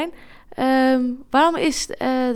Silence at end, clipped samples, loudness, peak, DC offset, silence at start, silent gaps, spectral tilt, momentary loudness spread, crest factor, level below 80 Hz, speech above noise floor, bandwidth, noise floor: 0 s; under 0.1%; -19 LUFS; -4 dBFS; under 0.1%; 0 s; none; -3 dB/octave; 9 LU; 16 dB; -50 dBFS; 20 dB; 13.5 kHz; -40 dBFS